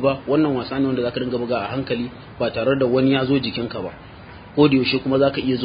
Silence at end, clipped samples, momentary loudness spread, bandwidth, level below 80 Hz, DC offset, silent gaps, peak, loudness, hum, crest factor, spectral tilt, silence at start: 0 s; under 0.1%; 13 LU; 5.2 kHz; -48 dBFS; under 0.1%; none; -2 dBFS; -20 LUFS; none; 18 dB; -11.5 dB/octave; 0 s